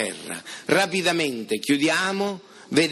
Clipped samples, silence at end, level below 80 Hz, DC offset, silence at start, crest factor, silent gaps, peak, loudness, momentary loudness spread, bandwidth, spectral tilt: under 0.1%; 0 s; -68 dBFS; under 0.1%; 0 s; 20 dB; none; -4 dBFS; -23 LUFS; 13 LU; 15 kHz; -3.5 dB/octave